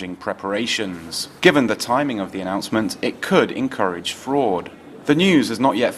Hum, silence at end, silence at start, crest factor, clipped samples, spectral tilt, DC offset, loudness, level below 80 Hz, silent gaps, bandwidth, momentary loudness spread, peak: none; 0 s; 0 s; 20 dB; under 0.1%; -4.5 dB/octave; under 0.1%; -20 LUFS; -58 dBFS; none; 14.5 kHz; 11 LU; 0 dBFS